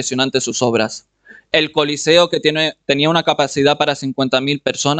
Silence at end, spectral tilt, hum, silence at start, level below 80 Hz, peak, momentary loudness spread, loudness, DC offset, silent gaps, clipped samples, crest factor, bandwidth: 0 s; -3.5 dB/octave; none; 0 s; -54 dBFS; 0 dBFS; 6 LU; -16 LUFS; under 0.1%; none; under 0.1%; 16 dB; 9.4 kHz